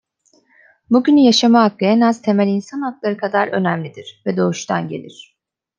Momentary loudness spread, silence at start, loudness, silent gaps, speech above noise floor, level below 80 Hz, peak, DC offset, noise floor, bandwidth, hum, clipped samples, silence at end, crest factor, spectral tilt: 14 LU; 0.9 s; -16 LUFS; none; 42 dB; -68 dBFS; -2 dBFS; under 0.1%; -58 dBFS; 7.6 kHz; none; under 0.1%; 0.7 s; 16 dB; -5.5 dB/octave